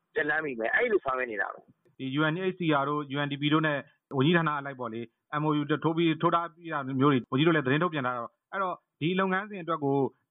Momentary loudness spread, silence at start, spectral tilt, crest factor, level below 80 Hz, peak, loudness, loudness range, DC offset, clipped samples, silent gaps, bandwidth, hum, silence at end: 10 LU; 0.15 s; -10.5 dB/octave; 18 dB; -72 dBFS; -10 dBFS; -28 LUFS; 2 LU; under 0.1%; under 0.1%; none; 4 kHz; none; 0.2 s